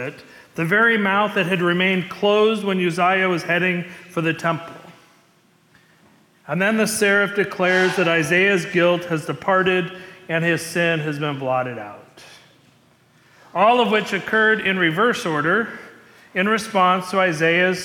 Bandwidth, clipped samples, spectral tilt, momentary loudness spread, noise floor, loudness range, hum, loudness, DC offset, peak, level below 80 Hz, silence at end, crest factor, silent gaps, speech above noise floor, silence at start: 18 kHz; under 0.1%; -5 dB/octave; 11 LU; -57 dBFS; 6 LU; none; -19 LUFS; under 0.1%; -6 dBFS; -66 dBFS; 0 s; 14 dB; none; 38 dB; 0 s